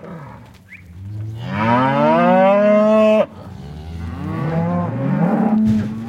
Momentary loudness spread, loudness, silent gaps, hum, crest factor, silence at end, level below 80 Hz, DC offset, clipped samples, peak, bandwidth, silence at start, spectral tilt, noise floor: 21 LU; -16 LUFS; none; none; 14 dB; 0 s; -46 dBFS; under 0.1%; under 0.1%; -4 dBFS; 7.8 kHz; 0 s; -8.5 dB/octave; -41 dBFS